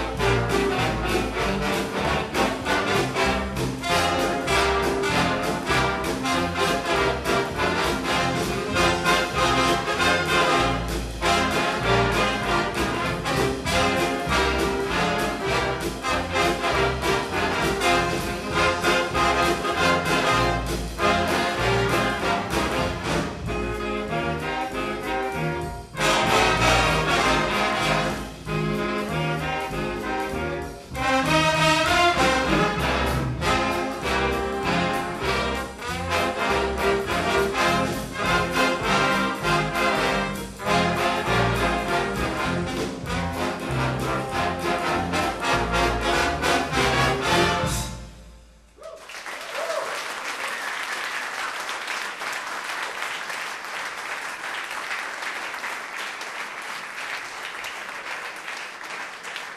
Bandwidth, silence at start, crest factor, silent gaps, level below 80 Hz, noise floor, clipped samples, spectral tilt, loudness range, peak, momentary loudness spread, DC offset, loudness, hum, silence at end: 14 kHz; 0 s; 18 dB; none; -38 dBFS; -49 dBFS; under 0.1%; -4 dB/octave; 8 LU; -6 dBFS; 10 LU; under 0.1%; -23 LUFS; none; 0 s